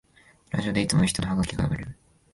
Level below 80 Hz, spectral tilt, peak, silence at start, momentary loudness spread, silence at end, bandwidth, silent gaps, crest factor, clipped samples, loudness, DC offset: -44 dBFS; -5 dB/octave; -8 dBFS; 0.5 s; 10 LU; 0.4 s; 12 kHz; none; 20 dB; under 0.1%; -26 LUFS; under 0.1%